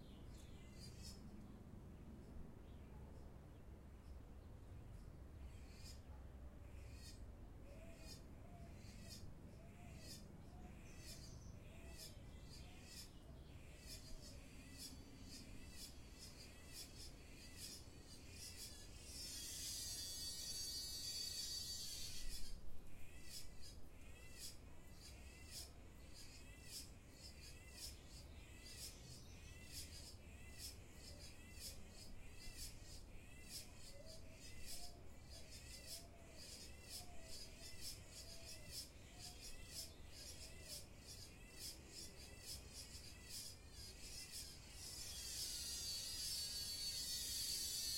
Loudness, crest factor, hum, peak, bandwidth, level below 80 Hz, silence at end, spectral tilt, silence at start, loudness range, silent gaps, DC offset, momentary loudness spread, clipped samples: -53 LUFS; 20 dB; none; -32 dBFS; 16.5 kHz; -62 dBFS; 0 s; -2 dB/octave; 0 s; 12 LU; none; under 0.1%; 15 LU; under 0.1%